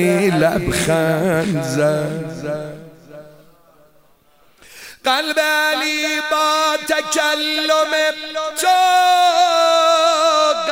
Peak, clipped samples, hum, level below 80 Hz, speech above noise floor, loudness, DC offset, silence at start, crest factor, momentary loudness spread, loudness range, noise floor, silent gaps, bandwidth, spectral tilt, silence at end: -2 dBFS; under 0.1%; none; -48 dBFS; 39 dB; -16 LUFS; 0.2%; 0 s; 14 dB; 10 LU; 10 LU; -55 dBFS; none; 16 kHz; -3.5 dB/octave; 0 s